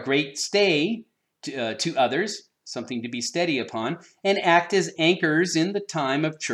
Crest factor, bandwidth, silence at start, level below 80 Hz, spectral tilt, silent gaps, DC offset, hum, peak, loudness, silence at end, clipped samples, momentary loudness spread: 20 dB; 12.5 kHz; 0 s; -78 dBFS; -4 dB/octave; none; under 0.1%; none; -6 dBFS; -24 LUFS; 0 s; under 0.1%; 12 LU